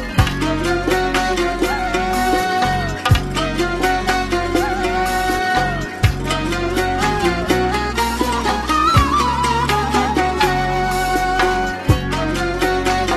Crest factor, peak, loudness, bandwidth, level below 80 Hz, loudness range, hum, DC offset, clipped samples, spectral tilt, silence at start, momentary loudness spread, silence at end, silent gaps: 16 dB; -2 dBFS; -18 LUFS; 14 kHz; -28 dBFS; 2 LU; none; under 0.1%; under 0.1%; -5 dB/octave; 0 s; 3 LU; 0 s; none